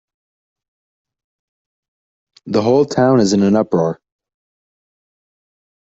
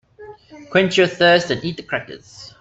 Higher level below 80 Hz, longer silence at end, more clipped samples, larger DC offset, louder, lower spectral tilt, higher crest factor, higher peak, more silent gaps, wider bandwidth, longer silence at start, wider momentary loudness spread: about the same, -58 dBFS vs -56 dBFS; first, 2 s vs 0.1 s; neither; neither; about the same, -15 LUFS vs -17 LUFS; first, -6.5 dB/octave vs -4.5 dB/octave; about the same, 18 dB vs 16 dB; about the same, -2 dBFS vs -4 dBFS; neither; about the same, 8 kHz vs 8 kHz; first, 2.45 s vs 0.2 s; second, 8 LU vs 23 LU